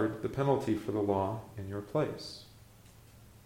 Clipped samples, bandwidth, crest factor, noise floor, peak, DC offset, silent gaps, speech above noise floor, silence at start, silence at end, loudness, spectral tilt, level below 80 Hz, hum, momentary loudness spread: under 0.1%; 16.5 kHz; 18 dB; -57 dBFS; -16 dBFS; under 0.1%; none; 24 dB; 0 s; 0.15 s; -34 LUFS; -7.5 dB/octave; -62 dBFS; none; 12 LU